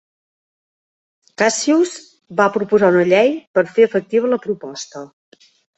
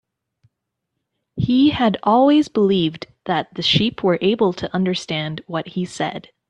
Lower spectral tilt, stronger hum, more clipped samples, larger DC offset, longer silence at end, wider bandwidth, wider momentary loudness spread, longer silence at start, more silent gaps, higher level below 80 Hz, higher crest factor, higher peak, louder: second, -4.5 dB/octave vs -6 dB/octave; neither; neither; neither; first, 0.7 s vs 0.3 s; second, 8.4 kHz vs 10 kHz; first, 16 LU vs 11 LU; about the same, 1.4 s vs 1.35 s; first, 3.47-3.54 s vs none; second, -64 dBFS vs -52 dBFS; about the same, 16 dB vs 18 dB; about the same, -2 dBFS vs -2 dBFS; first, -16 LUFS vs -19 LUFS